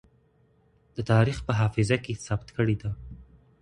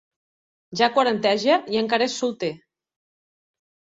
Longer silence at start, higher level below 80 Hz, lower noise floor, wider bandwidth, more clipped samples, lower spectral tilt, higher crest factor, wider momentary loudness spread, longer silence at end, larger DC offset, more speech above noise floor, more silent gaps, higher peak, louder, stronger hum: first, 0.95 s vs 0.7 s; first, -48 dBFS vs -68 dBFS; second, -64 dBFS vs under -90 dBFS; first, 10.5 kHz vs 8 kHz; neither; first, -6.5 dB/octave vs -3.5 dB/octave; about the same, 20 dB vs 22 dB; first, 16 LU vs 11 LU; second, 0.4 s vs 1.4 s; neither; second, 38 dB vs over 69 dB; neither; second, -8 dBFS vs -4 dBFS; second, -27 LUFS vs -22 LUFS; neither